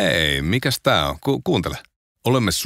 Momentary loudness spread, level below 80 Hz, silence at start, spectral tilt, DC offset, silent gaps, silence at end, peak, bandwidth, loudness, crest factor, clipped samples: 9 LU; -38 dBFS; 0 s; -4.5 dB/octave; under 0.1%; 1.96-2.15 s; 0 s; -4 dBFS; 16 kHz; -20 LUFS; 18 dB; under 0.1%